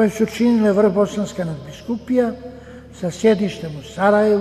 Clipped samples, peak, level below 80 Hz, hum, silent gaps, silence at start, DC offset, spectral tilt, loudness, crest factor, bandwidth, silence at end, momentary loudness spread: under 0.1%; -2 dBFS; -48 dBFS; none; none; 0 s; under 0.1%; -6.5 dB/octave; -19 LUFS; 16 dB; 13.5 kHz; 0 s; 16 LU